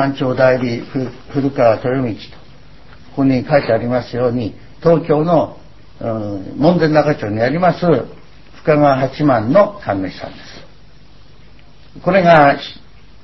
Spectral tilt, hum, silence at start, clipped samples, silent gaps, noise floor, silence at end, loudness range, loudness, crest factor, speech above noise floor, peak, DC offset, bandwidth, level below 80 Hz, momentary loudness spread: -8.5 dB/octave; none; 0 s; under 0.1%; none; -44 dBFS; 0.5 s; 3 LU; -15 LUFS; 16 dB; 30 dB; 0 dBFS; 1%; 6 kHz; -44 dBFS; 13 LU